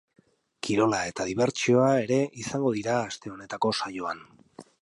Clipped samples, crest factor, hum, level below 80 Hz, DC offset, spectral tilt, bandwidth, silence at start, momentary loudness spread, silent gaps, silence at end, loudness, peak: under 0.1%; 18 dB; none; -64 dBFS; under 0.1%; -5 dB/octave; 11.5 kHz; 0.65 s; 13 LU; none; 0.2 s; -26 LUFS; -10 dBFS